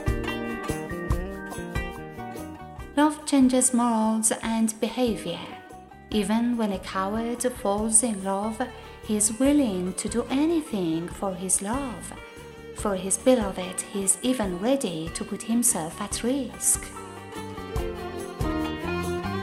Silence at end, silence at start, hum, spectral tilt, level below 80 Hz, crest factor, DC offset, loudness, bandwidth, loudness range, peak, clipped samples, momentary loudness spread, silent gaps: 0 s; 0 s; none; -4 dB/octave; -42 dBFS; 22 dB; under 0.1%; -26 LUFS; 16 kHz; 4 LU; -4 dBFS; under 0.1%; 16 LU; none